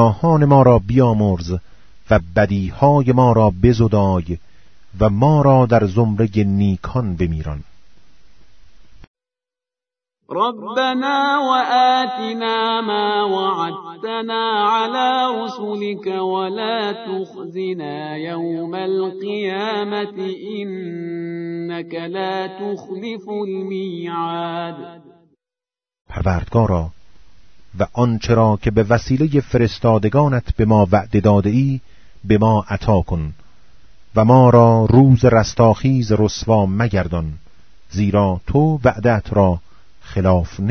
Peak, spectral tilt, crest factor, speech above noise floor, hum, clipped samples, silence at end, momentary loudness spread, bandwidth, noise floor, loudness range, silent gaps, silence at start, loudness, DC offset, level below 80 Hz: 0 dBFS; -7.5 dB/octave; 18 dB; over 74 dB; none; under 0.1%; 0 s; 14 LU; 6.6 kHz; under -90 dBFS; 12 LU; 9.07-9.14 s, 26.01-26.05 s; 0 s; -17 LUFS; under 0.1%; -36 dBFS